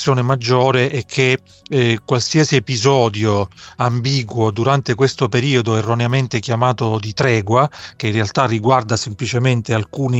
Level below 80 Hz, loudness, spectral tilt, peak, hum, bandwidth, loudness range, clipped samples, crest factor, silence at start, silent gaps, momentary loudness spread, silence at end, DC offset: -52 dBFS; -17 LUFS; -5.5 dB/octave; -2 dBFS; none; 8.2 kHz; 1 LU; under 0.1%; 16 dB; 0 s; none; 6 LU; 0 s; under 0.1%